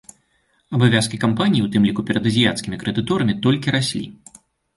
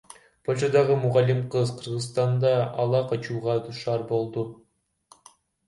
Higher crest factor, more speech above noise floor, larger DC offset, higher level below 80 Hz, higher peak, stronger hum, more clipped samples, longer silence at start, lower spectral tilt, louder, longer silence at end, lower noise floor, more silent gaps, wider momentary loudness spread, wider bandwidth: about the same, 18 dB vs 18 dB; first, 45 dB vs 35 dB; neither; first, -50 dBFS vs -64 dBFS; first, -2 dBFS vs -8 dBFS; neither; neither; first, 0.7 s vs 0.5 s; about the same, -5.5 dB/octave vs -6.5 dB/octave; first, -19 LUFS vs -25 LUFS; second, 0.65 s vs 1.15 s; first, -64 dBFS vs -59 dBFS; neither; about the same, 8 LU vs 9 LU; about the same, 11.5 kHz vs 11.5 kHz